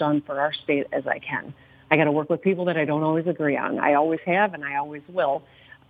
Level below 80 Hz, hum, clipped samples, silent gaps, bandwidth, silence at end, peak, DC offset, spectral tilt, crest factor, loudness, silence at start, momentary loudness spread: -68 dBFS; none; under 0.1%; none; 4.9 kHz; 0.5 s; -2 dBFS; under 0.1%; -9 dB/octave; 22 dB; -24 LUFS; 0 s; 9 LU